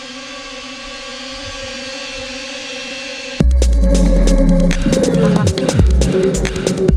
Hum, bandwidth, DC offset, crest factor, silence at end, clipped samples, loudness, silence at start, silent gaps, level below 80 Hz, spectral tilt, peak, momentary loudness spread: none; 12 kHz; under 0.1%; 14 dB; 0 s; under 0.1%; -16 LUFS; 0 s; none; -18 dBFS; -5.5 dB/octave; 0 dBFS; 14 LU